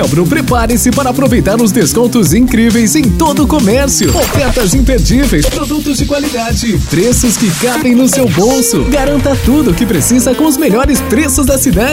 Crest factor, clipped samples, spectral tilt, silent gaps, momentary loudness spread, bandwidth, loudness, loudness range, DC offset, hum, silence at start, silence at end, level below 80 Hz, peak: 8 dB; under 0.1%; -4.5 dB/octave; none; 4 LU; 16.5 kHz; -10 LUFS; 2 LU; under 0.1%; none; 0 s; 0 s; -20 dBFS; 0 dBFS